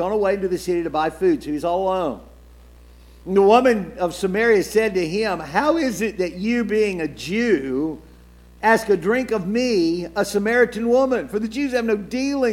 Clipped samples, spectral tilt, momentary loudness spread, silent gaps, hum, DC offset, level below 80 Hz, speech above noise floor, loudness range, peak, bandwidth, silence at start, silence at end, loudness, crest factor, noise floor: under 0.1%; -5.5 dB/octave; 7 LU; none; 60 Hz at -45 dBFS; under 0.1%; -46 dBFS; 27 dB; 3 LU; 0 dBFS; 16.5 kHz; 0 s; 0 s; -20 LUFS; 20 dB; -46 dBFS